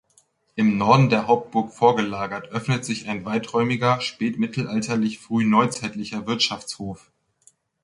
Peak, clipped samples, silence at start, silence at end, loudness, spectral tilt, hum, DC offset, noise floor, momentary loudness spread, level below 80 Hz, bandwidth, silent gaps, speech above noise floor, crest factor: -2 dBFS; under 0.1%; 0.55 s; 0.85 s; -22 LUFS; -5.5 dB/octave; none; under 0.1%; -62 dBFS; 12 LU; -58 dBFS; 11.5 kHz; none; 40 dB; 20 dB